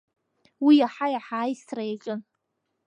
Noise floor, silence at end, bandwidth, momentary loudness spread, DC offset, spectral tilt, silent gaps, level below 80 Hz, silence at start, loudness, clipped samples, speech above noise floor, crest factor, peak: -79 dBFS; 0.65 s; 8.6 kHz; 15 LU; under 0.1%; -5.5 dB/octave; none; -82 dBFS; 0.6 s; -25 LUFS; under 0.1%; 55 dB; 18 dB; -8 dBFS